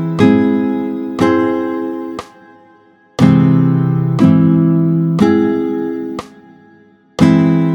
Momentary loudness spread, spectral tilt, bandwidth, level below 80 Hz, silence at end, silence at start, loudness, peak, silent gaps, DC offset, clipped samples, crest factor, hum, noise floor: 14 LU; -8.5 dB/octave; 8.4 kHz; -50 dBFS; 0 s; 0 s; -13 LUFS; 0 dBFS; none; under 0.1%; under 0.1%; 14 dB; none; -47 dBFS